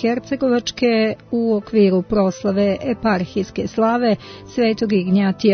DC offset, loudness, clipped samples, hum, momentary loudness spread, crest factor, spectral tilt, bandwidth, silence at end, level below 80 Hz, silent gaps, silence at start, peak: under 0.1%; -19 LUFS; under 0.1%; none; 6 LU; 14 dB; -6.5 dB/octave; 6.6 kHz; 0 s; -48 dBFS; none; 0 s; -4 dBFS